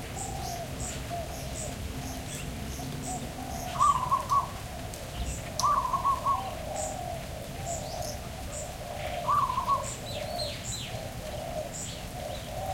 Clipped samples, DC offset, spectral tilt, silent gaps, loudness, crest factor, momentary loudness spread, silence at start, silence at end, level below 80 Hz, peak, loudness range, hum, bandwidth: under 0.1%; under 0.1%; -4 dB/octave; none; -32 LUFS; 20 dB; 11 LU; 0 s; 0 s; -44 dBFS; -12 dBFS; 6 LU; none; 17 kHz